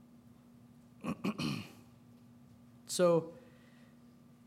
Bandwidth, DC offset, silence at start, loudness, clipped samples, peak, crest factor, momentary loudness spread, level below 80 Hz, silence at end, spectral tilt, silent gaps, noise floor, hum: 16 kHz; under 0.1%; 1.05 s; -35 LUFS; under 0.1%; -18 dBFS; 20 dB; 27 LU; -74 dBFS; 1.1 s; -5 dB/octave; none; -60 dBFS; none